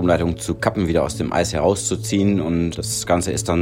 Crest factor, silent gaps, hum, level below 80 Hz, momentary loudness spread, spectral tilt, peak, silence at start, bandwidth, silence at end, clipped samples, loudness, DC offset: 16 dB; none; none; -40 dBFS; 3 LU; -5 dB/octave; -2 dBFS; 0 s; 16.5 kHz; 0 s; under 0.1%; -20 LUFS; under 0.1%